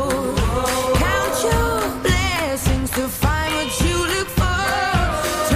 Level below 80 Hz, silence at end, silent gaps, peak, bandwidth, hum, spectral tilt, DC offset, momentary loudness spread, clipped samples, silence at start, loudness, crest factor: -26 dBFS; 0 s; none; -6 dBFS; 15.5 kHz; none; -4 dB/octave; under 0.1%; 2 LU; under 0.1%; 0 s; -19 LUFS; 14 dB